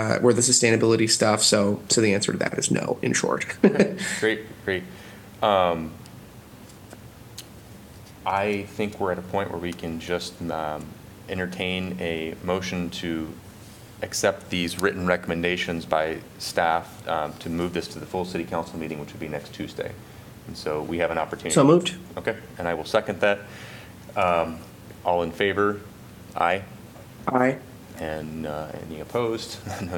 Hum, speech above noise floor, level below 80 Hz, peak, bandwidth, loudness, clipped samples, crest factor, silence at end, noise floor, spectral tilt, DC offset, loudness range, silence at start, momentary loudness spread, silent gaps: none; 21 dB; -54 dBFS; -4 dBFS; 18 kHz; -25 LUFS; under 0.1%; 22 dB; 0 s; -45 dBFS; -4 dB/octave; under 0.1%; 8 LU; 0 s; 23 LU; none